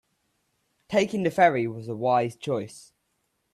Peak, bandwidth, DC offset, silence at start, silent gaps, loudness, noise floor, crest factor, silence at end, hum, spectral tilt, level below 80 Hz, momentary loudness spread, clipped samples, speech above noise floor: -8 dBFS; 13.5 kHz; under 0.1%; 0.9 s; none; -25 LUFS; -75 dBFS; 20 dB; 0.75 s; none; -6 dB/octave; -68 dBFS; 10 LU; under 0.1%; 50 dB